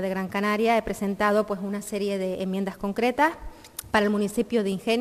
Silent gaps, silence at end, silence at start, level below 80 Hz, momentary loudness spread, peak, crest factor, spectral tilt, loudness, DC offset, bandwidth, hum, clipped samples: none; 0 s; 0 s; -50 dBFS; 7 LU; -8 dBFS; 18 dB; -5.5 dB/octave; -25 LUFS; under 0.1%; 14.5 kHz; none; under 0.1%